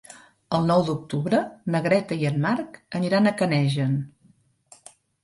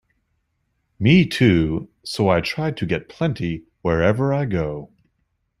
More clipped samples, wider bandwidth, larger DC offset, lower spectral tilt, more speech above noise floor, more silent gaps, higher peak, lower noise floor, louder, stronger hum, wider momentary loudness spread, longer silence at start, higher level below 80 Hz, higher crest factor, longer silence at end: neither; second, 11.5 kHz vs 13 kHz; neither; about the same, -7 dB/octave vs -7 dB/octave; second, 38 dB vs 52 dB; neither; second, -8 dBFS vs -2 dBFS; second, -60 dBFS vs -71 dBFS; second, -24 LUFS vs -20 LUFS; neither; second, 8 LU vs 12 LU; second, 0.1 s vs 1 s; second, -62 dBFS vs -44 dBFS; about the same, 16 dB vs 18 dB; first, 1.15 s vs 0.75 s